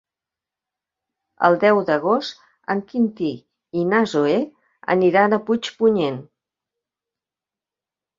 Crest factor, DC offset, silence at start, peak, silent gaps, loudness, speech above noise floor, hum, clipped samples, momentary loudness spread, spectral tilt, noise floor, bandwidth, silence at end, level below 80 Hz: 20 dB; under 0.1%; 1.4 s; -2 dBFS; none; -20 LUFS; 71 dB; none; under 0.1%; 16 LU; -6.5 dB/octave; -89 dBFS; 7.6 kHz; 1.95 s; -66 dBFS